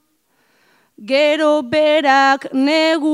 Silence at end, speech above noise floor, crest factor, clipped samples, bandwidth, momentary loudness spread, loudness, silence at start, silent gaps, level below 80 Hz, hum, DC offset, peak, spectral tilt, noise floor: 0 s; 48 dB; 16 dB; under 0.1%; 12.5 kHz; 4 LU; -14 LUFS; 1 s; none; -68 dBFS; none; under 0.1%; 0 dBFS; -3.5 dB/octave; -62 dBFS